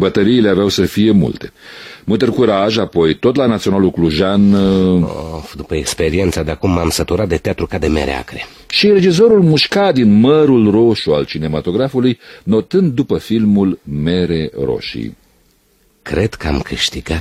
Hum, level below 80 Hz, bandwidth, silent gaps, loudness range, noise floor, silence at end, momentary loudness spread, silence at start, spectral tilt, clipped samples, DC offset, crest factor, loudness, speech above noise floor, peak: none; -34 dBFS; 15 kHz; none; 6 LU; -55 dBFS; 0 s; 13 LU; 0 s; -6 dB/octave; under 0.1%; under 0.1%; 12 dB; -14 LUFS; 42 dB; 0 dBFS